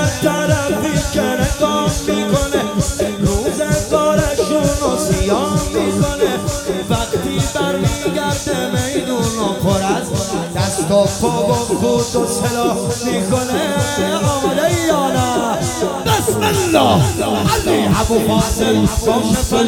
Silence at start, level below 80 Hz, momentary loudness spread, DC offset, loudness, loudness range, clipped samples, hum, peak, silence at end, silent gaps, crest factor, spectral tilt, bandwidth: 0 s; -30 dBFS; 4 LU; under 0.1%; -16 LUFS; 3 LU; under 0.1%; none; 0 dBFS; 0 s; none; 16 dB; -4.5 dB/octave; 17.5 kHz